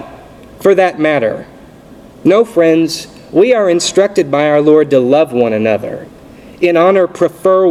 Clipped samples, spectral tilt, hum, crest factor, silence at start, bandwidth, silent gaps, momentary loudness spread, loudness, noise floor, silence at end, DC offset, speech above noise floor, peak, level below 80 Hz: under 0.1%; -5 dB/octave; none; 12 dB; 0 s; 15 kHz; none; 8 LU; -11 LUFS; -37 dBFS; 0 s; under 0.1%; 26 dB; 0 dBFS; -50 dBFS